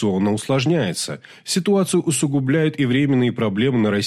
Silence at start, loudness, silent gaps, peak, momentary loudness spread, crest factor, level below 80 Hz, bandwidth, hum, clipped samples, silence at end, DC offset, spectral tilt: 0 s; -19 LUFS; none; -8 dBFS; 6 LU; 12 dB; -58 dBFS; 15 kHz; none; under 0.1%; 0 s; under 0.1%; -5.5 dB/octave